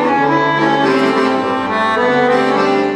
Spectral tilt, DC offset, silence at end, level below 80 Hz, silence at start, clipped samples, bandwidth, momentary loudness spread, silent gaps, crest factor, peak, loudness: -5.5 dB/octave; under 0.1%; 0 s; -54 dBFS; 0 s; under 0.1%; 11.5 kHz; 3 LU; none; 12 dB; -2 dBFS; -13 LUFS